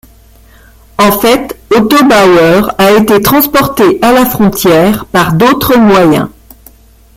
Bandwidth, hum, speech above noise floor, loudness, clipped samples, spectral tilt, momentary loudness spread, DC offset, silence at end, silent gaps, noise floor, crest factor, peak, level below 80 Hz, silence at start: 17 kHz; none; 32 dB; -7 LUFS; 0.2%; -5 dB/octave; 5 LU; under 0.1%; 0.9 s; none; -39 dBFS; 8 dB; 0 dBFS; -34 dBFS; 1 s